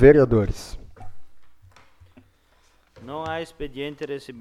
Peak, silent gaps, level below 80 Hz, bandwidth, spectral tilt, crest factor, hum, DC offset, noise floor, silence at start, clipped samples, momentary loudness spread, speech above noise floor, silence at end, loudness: -2 dBFS; none; -36 dBFS; 12 kHz; -7.5 dB/octave; 22 dB; none; under 0.1%; -59 dBFS; 0 s; under 0.1%; 23 LU; 39 dB; 0 s; -24 LUFS